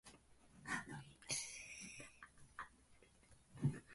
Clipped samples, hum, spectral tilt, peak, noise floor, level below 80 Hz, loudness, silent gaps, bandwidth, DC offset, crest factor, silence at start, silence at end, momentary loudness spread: under 0.1%; none; -3.5 dB/octave; -28 dBFS; -69 dBFS; -72 dBFS; -48 LUFS; none; 11.5 kHz; under 0.1%; 22 dB; 0.05 s; 0 s; 20 LU